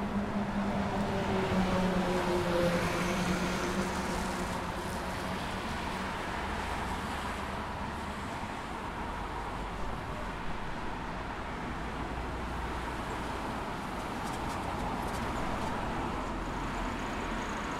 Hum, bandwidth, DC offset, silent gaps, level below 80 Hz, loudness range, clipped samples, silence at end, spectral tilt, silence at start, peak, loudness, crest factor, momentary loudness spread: none; 16 kHz; under 0.1%; none; -44 dBFS; 7 LU; under 0.1%; 0 s; -5.5 dB/octave; 0 s; -18 dBFS; -34 LUFS; 16 dB; 8 LU